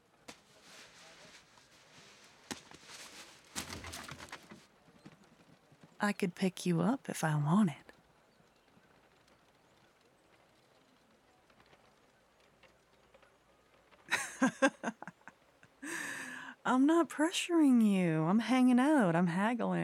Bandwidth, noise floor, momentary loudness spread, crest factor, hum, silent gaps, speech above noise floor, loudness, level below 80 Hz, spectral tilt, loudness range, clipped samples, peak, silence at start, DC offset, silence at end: 16 kHz; -68 dBFS; 25 LU; 22 dB; none; none; 38 dB; -32 LUFS; -76 dBFS; -5.5 dB/octave; 19 LU; under 0.1%; -14 dBFS; 0.3 s; under 0.1%; 0 s